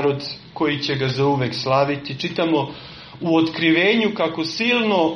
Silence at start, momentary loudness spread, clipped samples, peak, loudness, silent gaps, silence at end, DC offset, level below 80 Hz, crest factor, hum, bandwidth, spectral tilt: 0 s; 11 LU; under 0.1%; -4 dBFS; -20 LUFS; none; 0 s; under 0.1%; -56 dBFS; 16 dB; none; 6.8 kHz; -6 dB/octave